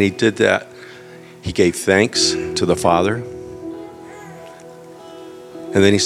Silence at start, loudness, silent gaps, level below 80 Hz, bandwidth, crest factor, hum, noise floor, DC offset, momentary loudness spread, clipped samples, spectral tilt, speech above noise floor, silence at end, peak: 0 s; -17 LUFS; none; -50 dBFS; 14.5 kHz; 20 dB; none; -39 dBFS; under 0.1%; 23 LU; under 0.1%; -4 dB/octave; 23 dB; 0 s; 0 dBFS